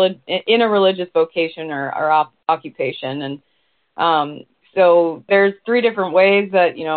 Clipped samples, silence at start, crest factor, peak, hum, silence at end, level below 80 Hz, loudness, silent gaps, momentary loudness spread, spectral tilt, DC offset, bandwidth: under 0.1%; 0 s; 14 dB; -2 dBFS; none; 0 s; -66 dBFS; -17 LUFS; none; 12 LU; -2.5 dB/octave; under 0.1%; 4.6 kHz